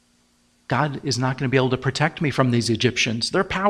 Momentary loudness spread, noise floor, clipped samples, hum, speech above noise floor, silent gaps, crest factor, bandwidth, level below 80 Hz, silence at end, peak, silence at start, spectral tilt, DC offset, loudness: 3 LU; -61 dBFS; under 0.1%; none; 40 dB; none; 20 dB; 12 kHz; -50 dBFS; 0 s; -2 dBFS; 0.7 s; -5 dB/octave; under 0.1%; -22 LUFS